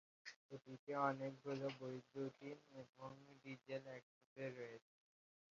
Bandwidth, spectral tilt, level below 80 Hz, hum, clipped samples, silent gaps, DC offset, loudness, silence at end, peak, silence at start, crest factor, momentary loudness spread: 7.4 kHz; -5 dB/octave; under -90 dBFS; none; under 0.1%; 0.36-0.49 s, 0.79-0.87 s, 2.89-2.93 s, 4.03-4.36 s; under 0.1%; -50 LUFS; 0.8 s; -26 dBFS; 0.25 s; 24 dB; 17 LU